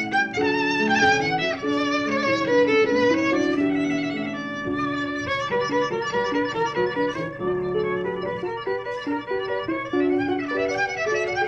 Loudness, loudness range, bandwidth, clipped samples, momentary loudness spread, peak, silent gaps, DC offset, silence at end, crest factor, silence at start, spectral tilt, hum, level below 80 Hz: -23 LUFS; 5 LU; 8.4 kHz; under 0.1%; 9 LU; -8 dBFS; none; under 0.1%; 0 s; 16 dB; 0 s; -5 dB/octave; none; -54 dBFS